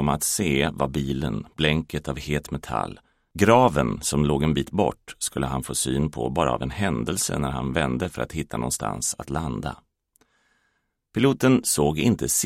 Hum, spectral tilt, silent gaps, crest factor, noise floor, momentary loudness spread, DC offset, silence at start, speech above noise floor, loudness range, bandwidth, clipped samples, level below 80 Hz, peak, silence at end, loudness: none; -4.5 dB/octave; none; 22 dB; -72 dBFS; 10 LU; under 0.1%; 0 s; 49 dB; 5 LU; 16 kHz; under 0.1%; -42 dBFS; -2 dBFS; 0 s; -24 LUFS